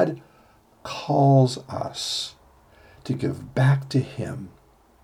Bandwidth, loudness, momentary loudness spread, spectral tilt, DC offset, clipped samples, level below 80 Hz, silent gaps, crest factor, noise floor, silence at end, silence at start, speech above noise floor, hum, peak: 12 kHz; -24 LUFS; 21 LU; -6.5 dB/octave; under 0.1%; under 0.1%; -58 dBFS; none; 18 dB; -56 dBFS; 0.55 s; 0 s; 34 dB; none; -6 dBFS